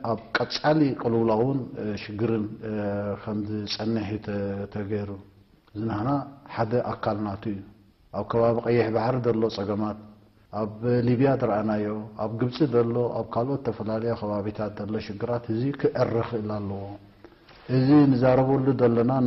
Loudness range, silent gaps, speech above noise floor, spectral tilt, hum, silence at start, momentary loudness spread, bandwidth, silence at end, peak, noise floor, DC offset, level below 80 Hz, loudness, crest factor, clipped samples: 6 LU; none; 26 dB; -8.5 dB/octave; none; 0 s; 11 LU; 6.2 kHz; 0 s; -8 dBFS; -51 dBFS; under 0.1%; -56 dBFS; -26 LUFS; 16 dB; under 0.1%